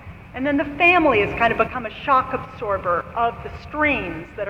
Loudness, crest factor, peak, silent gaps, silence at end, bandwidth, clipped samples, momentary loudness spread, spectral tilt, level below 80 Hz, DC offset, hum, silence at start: -20 LUFS; 18 dB; -4 dBFS; none; 0 s; 9.4 kHz; under 0.1%; 13 LU; -7 dB/octave; -42 dBFS; under 0.1%; none; 0 s